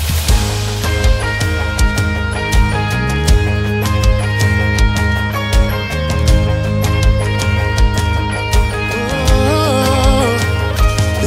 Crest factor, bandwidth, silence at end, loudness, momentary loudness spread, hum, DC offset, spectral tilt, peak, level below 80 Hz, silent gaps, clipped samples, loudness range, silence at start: 14 dB; 16.5 kHz; 0 s; -15 LUFS; 4 LU; none; under 0.1%; -5 dB/octave; 0 dBFS; -16 dBFS; none; under 0.1%; 1 LU; 0 s